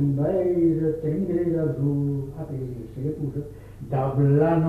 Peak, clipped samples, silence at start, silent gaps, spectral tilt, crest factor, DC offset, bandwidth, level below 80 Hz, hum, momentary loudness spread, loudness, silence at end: -10 dBFS; under 0.1%; 0 s; none; -11 dB/octave; 14 dB; under 0.1%; 3.3 kHz; -46 dBFS; none; 12 LU; -25 LUFS; 0 s